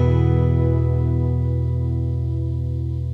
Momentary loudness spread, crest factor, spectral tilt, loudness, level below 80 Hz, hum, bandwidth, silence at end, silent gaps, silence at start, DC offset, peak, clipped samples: 7 LU; 12 dB; -11 dB/octave; -21 LUFS; -28 dBFS; none; 3.5 kHz; 0 s; none; 0 s; under 0.1%; -8 dBFS; under 0.1%